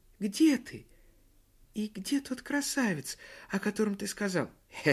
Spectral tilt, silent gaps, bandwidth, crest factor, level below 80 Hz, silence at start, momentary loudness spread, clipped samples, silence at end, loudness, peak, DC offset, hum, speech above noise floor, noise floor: -4.5 dB/octave; none; 15 kHz; 20 dB; -64 dBFS; 0.2 s; 15 LU; under 0.1%; 0 s; -32 LUFS; -12 dBFS; under 0.1%; none; 31 dB; -63 dBFS